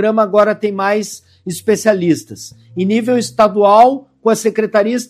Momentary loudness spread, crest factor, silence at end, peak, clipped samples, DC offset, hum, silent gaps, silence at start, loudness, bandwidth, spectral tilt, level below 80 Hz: 17 LU; 14 dB; 0.05 s; 0 dBFS; 0.1%; under 0.1%; none; none; 0 s; -14 LUFS; 15.5 kHz; -5 dB/octave; -60 dBFS